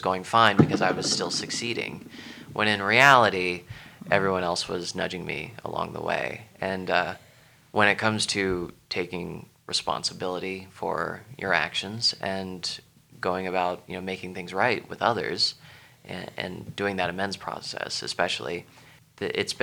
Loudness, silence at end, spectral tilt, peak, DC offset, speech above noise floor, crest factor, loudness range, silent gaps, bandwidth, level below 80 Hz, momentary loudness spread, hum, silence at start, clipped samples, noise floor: -26 LUFS; 0 s; -3.5 dB/octave; -2 dBFS; under 0.1%; 29 dB; 24 dB; 7 LU; none; 19.5 kHz; -60 dBFS; 14 LU; none; 0 s; under 0.1%; -56 dBFS